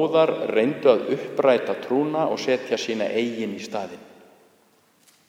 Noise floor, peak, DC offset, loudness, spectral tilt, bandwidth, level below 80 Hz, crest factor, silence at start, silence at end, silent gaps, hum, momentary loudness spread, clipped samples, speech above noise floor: -60 dBFS; -4 dBFS; under 0.1%; -23 LUFS; -5.5 dB/octave; 15 kHz; -78 dBFS; 18 dB; 0 s; 1.25 s; none; none; 11 LU; under 0.1%; 38 dB